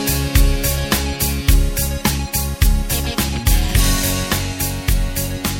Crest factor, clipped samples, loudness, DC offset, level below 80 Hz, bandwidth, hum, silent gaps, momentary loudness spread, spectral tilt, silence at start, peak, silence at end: 16 dB; under 0.1%; -18 LUFS; under 0.1%; -18 dBFS; 17 kHz; none; none; 4 LU; -4 dB/octave; 0 s; 0 dBFS; 0 s